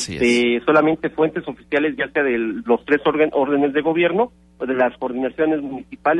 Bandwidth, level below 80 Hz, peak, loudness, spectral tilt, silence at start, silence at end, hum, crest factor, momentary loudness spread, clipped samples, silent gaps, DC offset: 11.5 kHz; -52 dBFS; -4 dBFS; -19 LUFS; -5 dB/octave; 0 s; 0 s; none; 14 dB; 8 LU; under 0.1%; none; under 0.1%